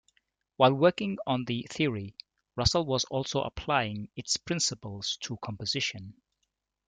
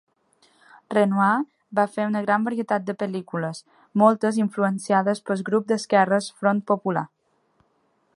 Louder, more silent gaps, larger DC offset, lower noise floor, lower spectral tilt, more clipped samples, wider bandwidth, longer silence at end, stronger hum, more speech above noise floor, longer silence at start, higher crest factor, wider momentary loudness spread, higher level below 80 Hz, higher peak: second, -29 LUFS vs -23 LUFS; neither; neither; first, -81 dBFS vs -67 dBFS; second, -4 dB/octave vs -6.5 dB/octave; neither; second, 9.6 kHz vs 11.5 kHz; second, 0.75 s vs 1.1 s; neither; first, 52 dB vs 45 dB; second, 0.6 s vs 0.9 s; about the same, 22 dB vs 20 dB; first, 13 LU vs 10 LU; first, -54 dBFS vs -76 dBFS; second, -8 dBFS vs -2 dBFS